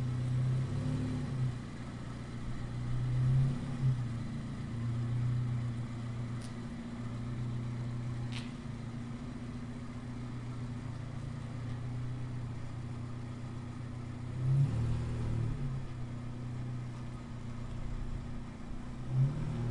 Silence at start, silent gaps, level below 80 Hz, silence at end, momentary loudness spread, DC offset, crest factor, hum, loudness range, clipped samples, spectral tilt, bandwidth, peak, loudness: 0 s; none; -48 dBFS; 0 s; 10 LU; 0.1%; 16 dB; none; 7 LU; under 0.1%; -8 dB/octave; 10.5 kHz; -20 dBFS; -38 LUFS